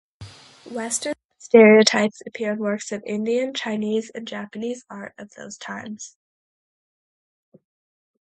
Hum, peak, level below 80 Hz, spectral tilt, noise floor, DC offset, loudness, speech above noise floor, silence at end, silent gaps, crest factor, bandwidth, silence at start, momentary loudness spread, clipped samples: none; 0 dBFS; -66 dBFS; -4 dB/octave; -44 dBFS; under 0.1%; -20 LUFS; 23 dB; 2.3 s; 1.25-1.29 s; 22 dB; 11.5 kHz; 0.2 s; 24 LU; under 0.1%